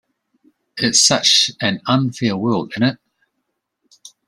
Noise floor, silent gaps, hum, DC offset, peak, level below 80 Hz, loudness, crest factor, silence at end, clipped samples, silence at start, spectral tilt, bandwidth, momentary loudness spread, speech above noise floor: -74 dBFS; none; none; under 0.1%; 0 dBFS; -60 dBFS; -15 LUFS; 20 dB; 0.2 s; under 0.1%; 0.75 s; -2.5 dB/octave; 16 kHz; 9 LU; 58 dB